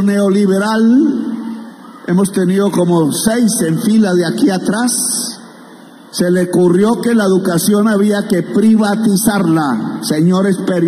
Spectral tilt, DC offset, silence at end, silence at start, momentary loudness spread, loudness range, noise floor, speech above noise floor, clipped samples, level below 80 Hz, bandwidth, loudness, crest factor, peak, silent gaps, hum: -5.5 dB/octave; under 0.1%; 0 s; 0 s; 7 LU; 2 LU; -37 dBFS; 25 dB; under 0.1%; -54 dBFS; 15.5 kHz; -13 LUFS; 10 dB; -2 dBFS; none; none